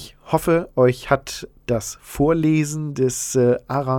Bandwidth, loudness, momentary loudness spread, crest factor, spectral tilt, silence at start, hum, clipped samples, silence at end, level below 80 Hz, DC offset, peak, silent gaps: 18 kHz; -20 LUFS; 8 LU; 18 dB; -6 dB/octave; 0 s; none; under 0.1%; 0 s; -44 dBFS; under 0.1%; -2 dBFS; none